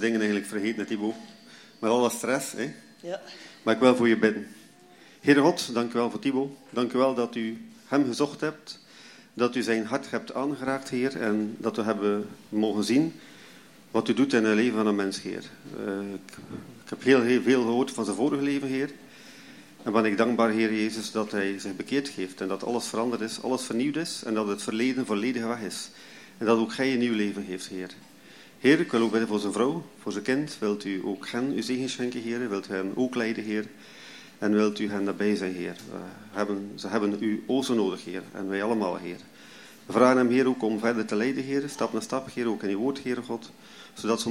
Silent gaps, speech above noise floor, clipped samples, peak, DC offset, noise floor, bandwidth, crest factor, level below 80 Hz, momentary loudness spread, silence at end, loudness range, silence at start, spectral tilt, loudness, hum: none; 26 dB; under 0.1%; -6 dBFS; under 0.1%; -53 dBFS; 16 kHz; 22 dB; -76 dBFS; 17 LU; 0 s; 4 LU; 0 s; -5 dB/octave; -27 LUFS; none